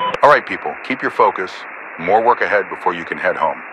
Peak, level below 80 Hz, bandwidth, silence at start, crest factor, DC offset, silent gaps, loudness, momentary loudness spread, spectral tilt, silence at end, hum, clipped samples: 0 dBFS; -58 dBFS; 11 kHz; 0 s; 16 dB; under 0.1%; none; -17 LUFS; 13 LU; -5 dB/octave; 0 s; none; 0.1%